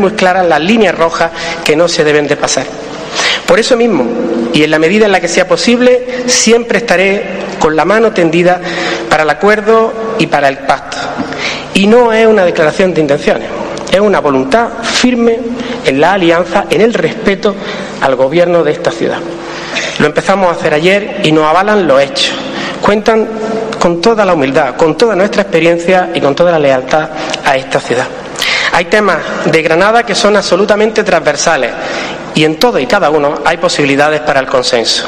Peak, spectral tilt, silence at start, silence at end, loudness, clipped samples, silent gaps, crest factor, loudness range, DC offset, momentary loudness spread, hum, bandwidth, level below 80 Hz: 0 dBFS; -4 dB/octave; 0 s; 0 s; -10 LUFS; 1%; none; 10 dB; 2 LU; under 0.1%; 7 LU; none; 14 kHz; -40 dBFS